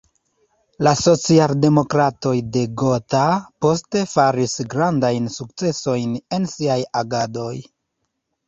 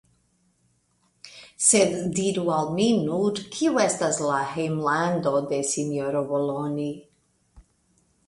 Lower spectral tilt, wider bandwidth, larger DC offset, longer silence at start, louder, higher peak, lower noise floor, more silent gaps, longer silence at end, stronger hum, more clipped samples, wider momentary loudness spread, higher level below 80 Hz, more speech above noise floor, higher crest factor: first, -5.5 dB/octave vs -4 dB/octave; second, 8 kHz vs 11.5 kHz; neither; second, 0.8 s vs 1.25 s; first, -19 LUFS vs -24 LUFS; first, -2 dBFS vs -6 dBFS; first, -75 dBFS vs -68 dBFS; neither; first, 0.85 s vs 0.65 s; neither; neither; about the same, 9 LU vs 9 LU; first, -54 dBFS vs -62 dBFS; first, 56 dB vs 44 dB; about the same, 18 dB vs 20 dB